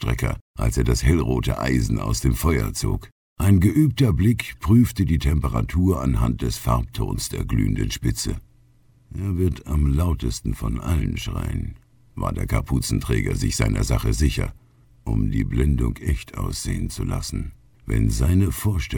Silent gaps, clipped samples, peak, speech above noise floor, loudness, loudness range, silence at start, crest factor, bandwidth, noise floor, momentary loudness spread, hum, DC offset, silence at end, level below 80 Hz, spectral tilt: 0.41-0.54 s, 3.12-3.36 s; under 0.1%; -4 dBFS; 34 dB; -23 LUFS; 5 LU; 0 s; 18 dB; 20 kHz; -55 dBFS; 9 LU; none; under 0.1%; 0 s; -28 dBFS; -6 dB/octave